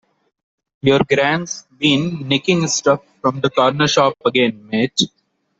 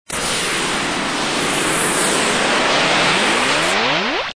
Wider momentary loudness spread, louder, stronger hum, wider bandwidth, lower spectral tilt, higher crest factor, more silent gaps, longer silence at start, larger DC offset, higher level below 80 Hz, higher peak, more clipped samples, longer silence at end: about the same, 6 LU vs 5 LU; about the same, -17 LUFS vs -16 LUFS; neither; second, 8.2 kHz vs 11 kHz; first, -4 dB/octave vs -2 dB/octave; about the same, 16 dB vs 14 dB; neither; first, 0.85 s vs 0.1 s; neither; second, -54 dBFS vs -44 dBFS; about the same, -2 dBFS vs -4 dBFS; neither; first, 0.55 s vs 0.05 s